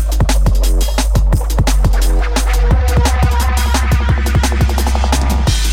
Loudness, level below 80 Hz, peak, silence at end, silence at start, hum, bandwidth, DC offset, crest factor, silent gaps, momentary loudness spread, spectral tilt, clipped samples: -14 LUFS; -12 dBFS; 0 dBFS; 0 s; 0 s; none; 16.5 kHz; under 0.1%; 12 dB; none; 2 LU; -5 dB/octave; under 0.1%